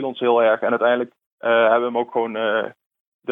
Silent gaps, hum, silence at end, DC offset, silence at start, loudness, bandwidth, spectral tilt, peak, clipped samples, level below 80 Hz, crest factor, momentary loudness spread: 1.26-1.38 s, 2.86-2.90 s, 3.00-3.19 s; none; 0 s; under 0.1%; 0 s; -19 LUFS; 3.9 kHz; -7 dB/octave; -4 dBFS; under 0.1%; -76 dBFS; 16 dB; 12 LU